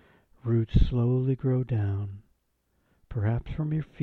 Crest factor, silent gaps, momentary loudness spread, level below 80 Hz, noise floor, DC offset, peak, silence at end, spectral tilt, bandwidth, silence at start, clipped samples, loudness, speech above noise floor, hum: 20 dB; none; 13 LU; -36 dBFS; -73 dBFS; under 0.1%; -8 dBFS; 0 s; -10.5 dB/octave; 4.5 kHz; 0.45 s; under 0.1%; -28 LUFS; 47 dB; none